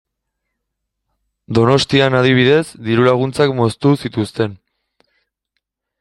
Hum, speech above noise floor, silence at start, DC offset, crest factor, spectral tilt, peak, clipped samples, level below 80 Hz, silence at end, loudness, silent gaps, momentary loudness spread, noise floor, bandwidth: none; 62 dB; 1.5 s; under 0.1%; 16 dB; -6 dB/octave; 0 dBFS; under 0.1%; -50 dBFS; 1.45 s; -15 LUFS; none; 8 LU; -76 dBFS; 12 kHz